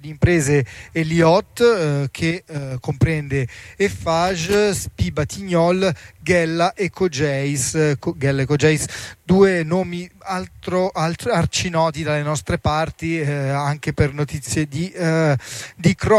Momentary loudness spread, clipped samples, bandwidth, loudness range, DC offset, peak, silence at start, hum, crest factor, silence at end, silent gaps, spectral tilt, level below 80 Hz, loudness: 10 LU; under 0.1%; 15 kHz; 3 LU; under 0.1%; -2 dBFS; 0 s; none; 16 dB; 0 s; none; -5.5 dB/octave; -40 dBFS; -20 LUFS